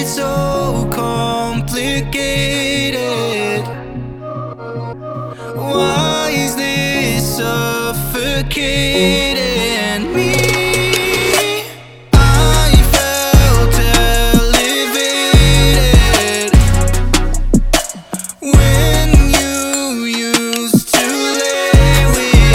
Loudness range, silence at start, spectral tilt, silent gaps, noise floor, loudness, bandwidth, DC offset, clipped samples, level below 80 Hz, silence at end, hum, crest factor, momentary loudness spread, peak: 7 LU; 0 s; -4 dB/octave; none; -32 dBFS; -13 LUFS; 18 kHz; under 0.1%; under 0.1%; -16 dBFS; 0 s; none; 12 dB; 12 LU; 0 dBFS